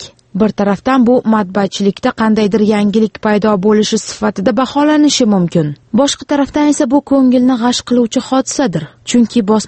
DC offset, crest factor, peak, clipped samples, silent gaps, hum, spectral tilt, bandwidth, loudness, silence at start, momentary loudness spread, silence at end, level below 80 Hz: under 0.1%; 12 dB; 0 dBFS; under 0.1%; none; none; -5 dB/octave; 8.8 kHz; -12 LUFS; 0 s; 5 LU; 0 s; -46 dBFS